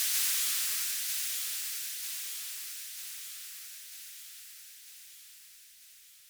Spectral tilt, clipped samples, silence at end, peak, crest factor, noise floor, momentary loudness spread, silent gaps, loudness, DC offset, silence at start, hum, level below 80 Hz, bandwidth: 4.5 dB/octave; under 0.1%; 0 s; -16 dBFS; 20 dB; -56 dBFS; 23 LU; none; -32 LUFS; under 0.1%; 0 s; none; -86 dBFS; over 20 kHz